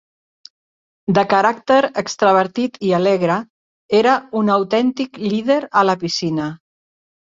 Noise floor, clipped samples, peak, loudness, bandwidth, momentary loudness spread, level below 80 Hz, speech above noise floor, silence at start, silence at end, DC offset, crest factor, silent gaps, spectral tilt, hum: under -90 dBFS; under 0.1%; 0 dBFS; -17 LUFS; 7.8 kHz; 7 LU; -60 dBFS; over 74 dB; 1.1 s; 0.75 s; under 0.1%; 18 dB; 3.50-3.89 s; -5.5 dB/octave; none